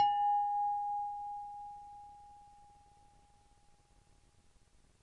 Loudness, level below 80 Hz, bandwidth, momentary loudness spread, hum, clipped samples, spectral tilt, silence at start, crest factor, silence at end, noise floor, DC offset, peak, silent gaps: -36 LUFS; -70 dBFS; 10.5 kHz; 25 LU; none; under 0.1%; -2.5 dB/octave; 0 s; 18 dB; 2.35 s; -66 dBFS; under 0.1%; -20 dBFS; none